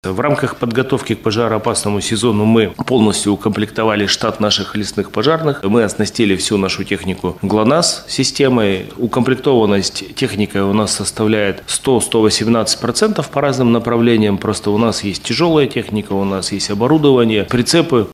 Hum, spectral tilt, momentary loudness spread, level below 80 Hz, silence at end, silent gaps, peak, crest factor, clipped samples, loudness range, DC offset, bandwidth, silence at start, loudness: none; -4.5 dB/octave; 6 LU; -46 dBFS; 0 s; none; 0 dBFS; 14 dB; under 0.1%; 1 LU; under 0.1%; 15 kHz; 0.05 s; -15 LUFS